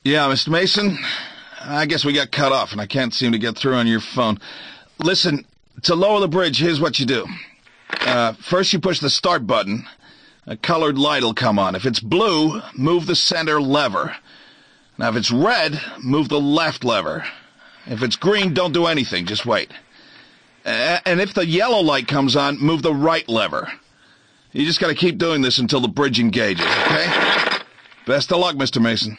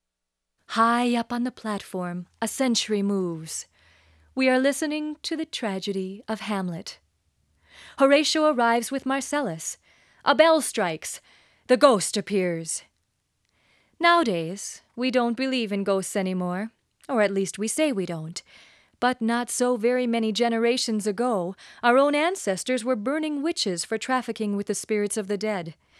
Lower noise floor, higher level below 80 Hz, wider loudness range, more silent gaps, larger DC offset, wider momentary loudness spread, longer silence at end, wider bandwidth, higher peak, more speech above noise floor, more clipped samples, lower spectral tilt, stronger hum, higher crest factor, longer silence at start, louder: second, -53 dBFS vs -83 dBFS; first, -56 dBFS vs -70 dBFS; about the same, 2 LU vs 4 LU; neither; neither; second, 10 LU vs 13 LU; second, 0 s vs 0.25 s; second, 9.8 kHz vs 14 kHz; second, -6 dBFS vs -2 dBFS; second, 35 dB vs 58 dB; neither; about the same, -4.5 dB/octave vs -4 dB/octave; neither; second, 14 dB vs 22 dB; second, 0.05 s vs 0.7 s; first, -18 LUFS vs -25 LUFS